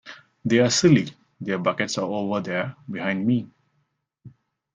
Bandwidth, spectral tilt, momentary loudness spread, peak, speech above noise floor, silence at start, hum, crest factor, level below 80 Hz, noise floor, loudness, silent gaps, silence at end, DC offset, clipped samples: 9.8 kHz; -5 dB/octave; 16 LU; -4 dBFS; 50 dB; 0.05 s; none; 20 dB; -64 dBFS; -72 dBFS; -23 LUFS; none; 0.45 s; under 0.1%; under 0.1%